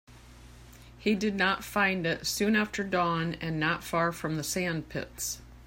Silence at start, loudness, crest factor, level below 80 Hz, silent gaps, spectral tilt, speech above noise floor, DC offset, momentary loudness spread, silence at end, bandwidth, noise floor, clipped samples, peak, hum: 0.1 s; -29 LUFS; 18 dB; -54 dBFS; none; -4 dB/octave; 21 dB; under 0.1%; 8 LU; 0 s; 16.5 kHz; -51 dBFS; under 0.1%; -12 dBFS; none